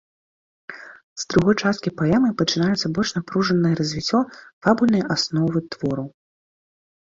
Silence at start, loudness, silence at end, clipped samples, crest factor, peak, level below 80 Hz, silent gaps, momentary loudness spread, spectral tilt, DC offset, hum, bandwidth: 0.7 s; -21 LUFS; 0.9 s; under 0.1%; 20 dB; -2 dBFS; -54 dBFS; 1.03-1.16 s, 4.53-4.61 s; 15 LU; -5.5 dB/octave; under 0.1%; none; 7.8 kHz